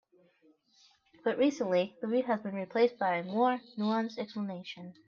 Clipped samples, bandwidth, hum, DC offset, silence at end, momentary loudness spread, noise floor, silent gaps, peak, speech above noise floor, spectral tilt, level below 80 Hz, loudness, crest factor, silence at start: under 0.1%; 7.4 kHz; none; under 0.1%; 0.15 s; 9 LU; -67 dBFS; none; -16 dBFS; 36 dB; -6 dB/octave; -82 dBFS; -32 LUFS; 18 dB; 1.25 s